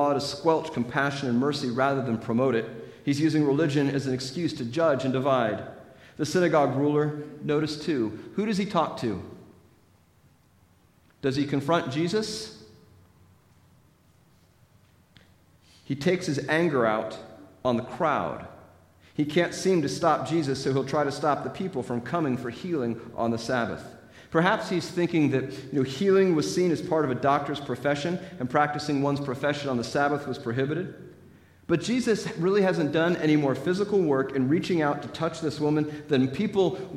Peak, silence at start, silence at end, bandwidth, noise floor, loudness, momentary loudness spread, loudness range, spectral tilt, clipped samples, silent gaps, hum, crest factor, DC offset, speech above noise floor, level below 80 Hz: -8 dBFS; 0 s; 0 s; 14 kHz; -61 dBFS; -26 LUFS; 8 LU; 6 LU; -6 dB/octave; under 0.1%; none; none; 20 dB; under 0.1%; 35 dB; -62 dBFS